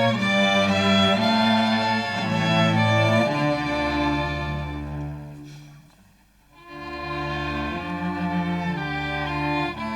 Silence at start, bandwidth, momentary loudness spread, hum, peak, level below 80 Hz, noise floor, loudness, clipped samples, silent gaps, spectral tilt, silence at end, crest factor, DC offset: 0 s; 14 kHz; 14 LU; none; -8 dBFS; -44 dBFS; -56 dBFS; -22 LUFS; under 0.1%; none; -5.5 dB/octave; 0 s; 16 dB; under 0.1%